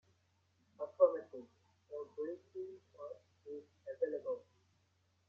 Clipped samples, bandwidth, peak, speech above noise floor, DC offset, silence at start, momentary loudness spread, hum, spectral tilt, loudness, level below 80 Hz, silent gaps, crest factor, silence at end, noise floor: under 0.1%; 6.2 kHz; -16 dBFS; 32 dB; under 0.1%; 0.8 s; 20 LU; none; -6 dB/octave; -39 LUFS; under -90 dBFS; none; 26 dB; 0.9 s; -77 dBFS